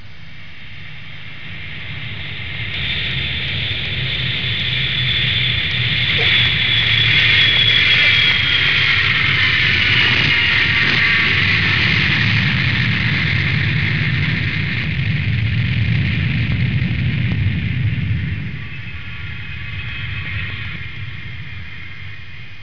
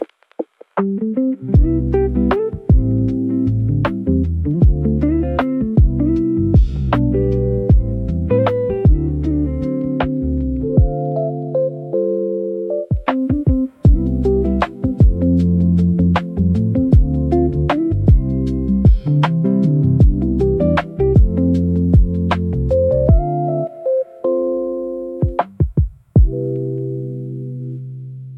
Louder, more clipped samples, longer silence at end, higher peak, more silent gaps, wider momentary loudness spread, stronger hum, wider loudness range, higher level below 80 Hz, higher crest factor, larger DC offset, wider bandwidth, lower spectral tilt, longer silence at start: about the same, -15 LUFS vs -17 LUFS; neither; about the same, 0 s vs 0 s; about the same, -4 dBFS vs -2 dBFS; neither; first, 19 LU vs 7 LU; neither; first, 13 LU vs 4 LU; second, -36 dBFS vs -22 dBFS; about the same, 14 dB vs 14 dB; first, 3% vs under 0.1%; about the same, 5.4 kHz vs 5.6 kHz; second, -5 dB/octave vs -10.5 dB/octave; about the same, 0 s vs 0 s